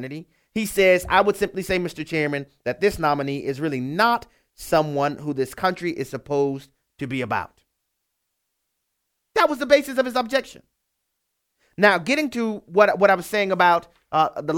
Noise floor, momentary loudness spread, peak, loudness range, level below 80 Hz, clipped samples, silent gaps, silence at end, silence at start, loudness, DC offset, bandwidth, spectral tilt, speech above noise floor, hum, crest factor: -77 dBFS; 11 LU; 0 dBFS; 8 LU; -52 dBFS; under 0.1%; none; 0 s; 0 s; -22 LUFS; under 0.1%; 19.5 kHz; -5 dB/octave; 56 dB; none; 22 dB